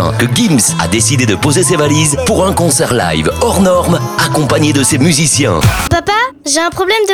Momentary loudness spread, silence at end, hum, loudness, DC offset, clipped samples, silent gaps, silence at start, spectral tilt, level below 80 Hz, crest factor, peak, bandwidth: 4 LU; 0 s; none; -10 LUFS; under 0.1%; under 0.1%; none; 0 s; -4 dB/octave; -30 dBFS; 10 dB; 0 dBFS; over 20 kHz